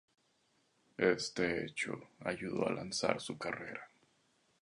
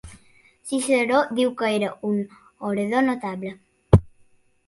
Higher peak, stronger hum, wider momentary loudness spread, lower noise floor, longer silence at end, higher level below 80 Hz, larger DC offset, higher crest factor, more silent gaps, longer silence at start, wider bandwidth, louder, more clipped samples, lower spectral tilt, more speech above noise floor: second, -12 dBFS vs 0 dBFS; neither; second, 10 LU vs 14 LU; first, -75 dBFS vs -58 dBFS; first, 0.75 s vs 0.6 s; second, -70 dBFS vs -38 dBFS; neither; about the same, 26 dB vs 24 dB; neither; first, 1 s vs 0.05 s; about the same, 11 kHz vs 11.5 kHz; second, -37 LUFS vs -23 LUFS; neither; second, -4 dB/octave vs -6 dB/octave; about the same, 38 dB vs 35 dB